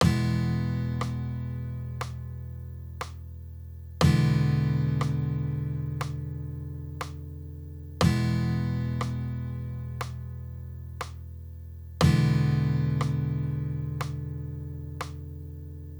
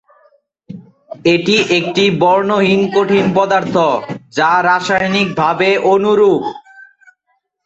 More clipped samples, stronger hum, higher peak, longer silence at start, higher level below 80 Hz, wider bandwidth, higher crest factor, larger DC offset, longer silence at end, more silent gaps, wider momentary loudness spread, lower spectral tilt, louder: neither; neither; second, -8 dBFS vs 0 dBFS; second, 0 s vs 0.7 s; first, -42 dBFS vs -54 dBFS; first, over 20 kHz vs 8 kHz; first, 20 dB vs 14 dB; neither; second, 0 s vs 0.85 s; neither; first, 17 LU vs 6 LU; first, -7 dB/octave vs -5.5 dB/octave; second, -29 LUFS vs -13 LUFS